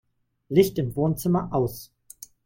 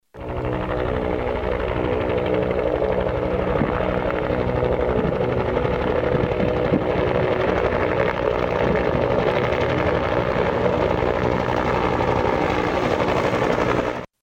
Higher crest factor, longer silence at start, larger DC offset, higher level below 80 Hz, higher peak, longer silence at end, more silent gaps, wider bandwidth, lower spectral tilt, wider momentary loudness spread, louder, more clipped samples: first, 20 dB vs 14 dB; first, 0.5 s vs 0.15 s; neither; second, -52 dBFS vs -34 dBFS; about the same, -6 dBFS vs -6 dBFS; first, 0.6 s vs 0.15 s; neither; about the same, 17 kHz vs 16 kHz; about the same, -7 dB/octave vs -7.5 dB/octave; first, 21 LU vs 3 LU; second, -24 LUFS vs -21 LUFS; neither